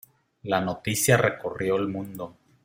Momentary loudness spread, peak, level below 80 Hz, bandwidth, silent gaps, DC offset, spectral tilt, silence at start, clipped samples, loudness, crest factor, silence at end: 18 LU; -4 dBFS; -58 dBFS; 16.5 kHz; none; under 0.1%; -4.5 dB/octave; 0.45 s; under 0.1%; -25 LUFS; 22 dB; 0.35 s